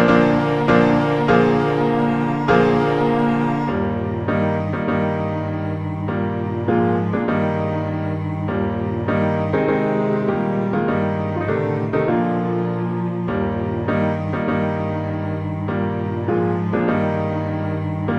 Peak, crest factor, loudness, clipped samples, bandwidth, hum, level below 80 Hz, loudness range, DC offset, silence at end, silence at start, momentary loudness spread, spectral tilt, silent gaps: -2 dBFS; 16 dB; -20 LUFS; under 0.1%; 7.8 kHz; none; -46 dBFS; 5 LU; under 0.1%; 0 s; 0 s; 8 LU; -9 dB/octave; none